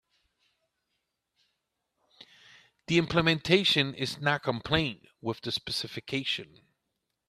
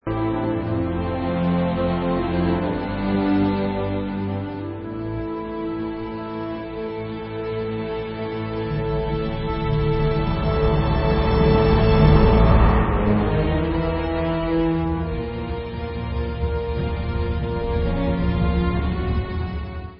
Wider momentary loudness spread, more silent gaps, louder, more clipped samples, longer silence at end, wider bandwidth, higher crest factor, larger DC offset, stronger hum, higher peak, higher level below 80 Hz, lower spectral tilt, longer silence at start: about the same, 11 LU vs 12 LU; neither; second, -28 LUFS vs -22 LUFS; neither; first, 0.85 s vs 0 s; first, 14 kHz vs 5.6 kHz; first, 24 dB vs 18 dB; neither; neither; second, -8 dBFS vs -2 dBFS; second, -58 dBFS vs -26 dBFS; second, -5 dB/octave vs -12.5 dB/octave; first, 2.9 s vs 0.05 s